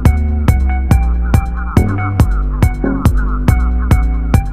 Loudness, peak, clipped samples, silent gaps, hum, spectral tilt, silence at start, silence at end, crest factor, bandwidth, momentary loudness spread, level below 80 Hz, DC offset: -14 LUFS; 0 dBFS; 0.2%; none; none; -7.5 dB/octave; 0 s; 0 s; 12 dB; 16 kHz; 2 LU; -14 dBFS; 2%